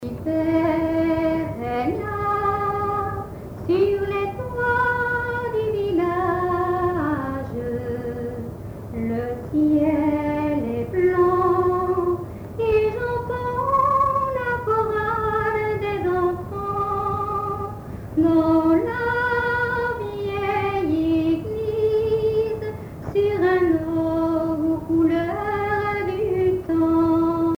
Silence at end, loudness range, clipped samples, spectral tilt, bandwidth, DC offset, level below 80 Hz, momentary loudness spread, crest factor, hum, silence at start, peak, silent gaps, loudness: 0 s; 3 LU; under 0.1%; -8 dB/octave; over 20 kHz; under 0.1%; -42 dBFS; 9 LU; 14 dB; none; 0 s; -8 dBFS; none; -22 LUFS